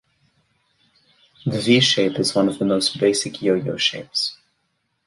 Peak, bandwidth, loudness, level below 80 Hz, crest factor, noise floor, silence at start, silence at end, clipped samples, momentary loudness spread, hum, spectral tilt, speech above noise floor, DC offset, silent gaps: -4 dBFS; 11.5 kHz; -19 LUFS; -60 dBFS; 18 dB; -71 dBFS; 1.45 s; 0.7 s; under 0.1%; 8 LU; none; -4 dB/octave; 52 dB; under 0.1%; none